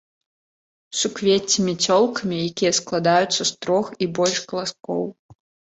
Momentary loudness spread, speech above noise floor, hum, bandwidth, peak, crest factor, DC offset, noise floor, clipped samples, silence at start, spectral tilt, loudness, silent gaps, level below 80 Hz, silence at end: 9 LU; over 69 dB; none; 8.4 kHz; -4 dBFS; 18 dB; under 0.1%; under -90 dBFS; under 0.1%; 0.9 s; -3.5 dB/octave; -21 LUFS; 5.19-5.29 s; -62 dBFS; 0.45 s